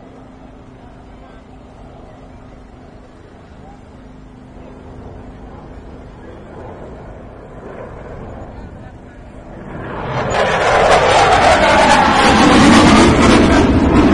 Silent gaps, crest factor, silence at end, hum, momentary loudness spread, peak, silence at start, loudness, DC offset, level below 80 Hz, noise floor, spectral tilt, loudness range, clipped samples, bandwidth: none; 14 dB; 0 s; none; 27 LU; 0 dBFS; 2.35 s; -10 LUFS; under 0.1%; -30 dBFS; -39 dBFS; -5 dB/octave; 26 LU; under 0.1%; 11.5 kHz